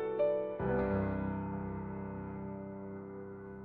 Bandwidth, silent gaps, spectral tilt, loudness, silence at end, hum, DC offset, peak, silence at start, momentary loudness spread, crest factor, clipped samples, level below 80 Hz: 4.5 kHz; none; -8.5 dB/octave; -38 LUFS; 0 s; none; under 0.1%; -20 dBFS; 0 s; 13 LU; 16 dB; under 0.1%; -54 dBFS